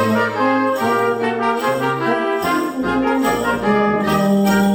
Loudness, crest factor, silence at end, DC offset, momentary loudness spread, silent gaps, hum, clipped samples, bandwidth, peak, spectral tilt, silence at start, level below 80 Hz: -17 LUFS; 12 dB; 0 s; under 0.1%; 3 LU; none; none; under 0.1%; 16.5 kHz; -4 dBFS; -6 dB/octave; 0 s; -46 dBFS